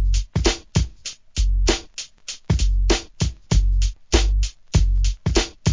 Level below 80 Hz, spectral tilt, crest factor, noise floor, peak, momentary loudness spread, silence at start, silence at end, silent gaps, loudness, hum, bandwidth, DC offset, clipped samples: -22 dBFS; -4.5 dB/octave; 18 dB; -37 dBFS; 0 dBFS; 9 LU; 0 s; 0 s; none; -22 LUFS; none; 7.6 kHz; 0.2%; under 0.1%